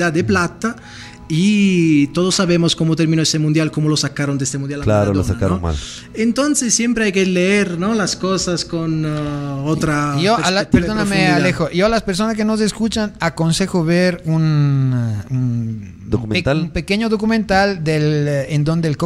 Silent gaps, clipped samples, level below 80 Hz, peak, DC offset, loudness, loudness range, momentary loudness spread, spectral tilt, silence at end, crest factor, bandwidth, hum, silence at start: none; under 0.1%; -38 dBFS; 0 dBFS; under 0.1%; -17 LUFS; 2 LU; 7 LU; -5 dB/octave; 0 s; 16 dB; 13 kHz; none; 0 s